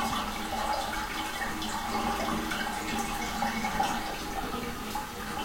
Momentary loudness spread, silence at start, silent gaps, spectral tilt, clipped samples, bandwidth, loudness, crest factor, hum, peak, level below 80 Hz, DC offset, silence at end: 5 LU; 0 s; none; -3 dB/octave; under 0.1%; 16.5 kHz; -32 LUFS; 16 dB; none; -16 dBFS; -46 dBFS; under 0.1%; 0 s